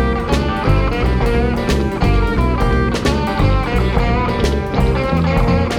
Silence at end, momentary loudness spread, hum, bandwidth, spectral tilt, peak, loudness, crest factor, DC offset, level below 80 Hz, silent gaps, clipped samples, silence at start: 0 s; 2 LU; none; 14 kHz; -7 dB/octave; -2 dBFS; -16 LUFS; 12 dB; under 0.1%; -20 dBFS; none; under 0.1%; 0 s